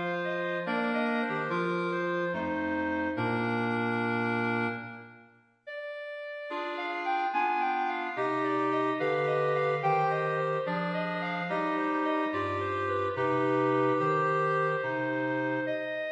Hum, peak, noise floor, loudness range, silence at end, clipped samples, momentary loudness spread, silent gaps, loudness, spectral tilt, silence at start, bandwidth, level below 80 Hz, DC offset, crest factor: none; -16 dBFS; -59 dBFS; 5 LU; 0 s; under 0.1%; 7 LU; none; -30 LUFS; -7.5 dB/octave; 0 s; 8.8 kHz; -72 dBFS; under 0.1%; 14 dB